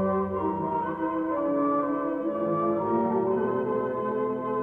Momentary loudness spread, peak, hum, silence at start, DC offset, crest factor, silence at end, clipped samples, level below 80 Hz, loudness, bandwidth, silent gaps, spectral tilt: 3 LU; -14 dBFS; none; 0 s; under 0.1%; 12 dB; 0 s; under 0.1%; -60 dBFS; -27 LUFS; 3.8 kHz; none; -10.5 dB/octave